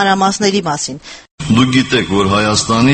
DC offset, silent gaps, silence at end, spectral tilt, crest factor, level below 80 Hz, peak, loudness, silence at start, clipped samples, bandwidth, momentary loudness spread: under 0.1%; 1.31-1.38 s; 0 s; -4.5 dB/octave; 14 dB; -40 dBFS; 0 dBFS; -13 LUFS; 0 s; under 0.1%; 8.8 kHz; 13 LU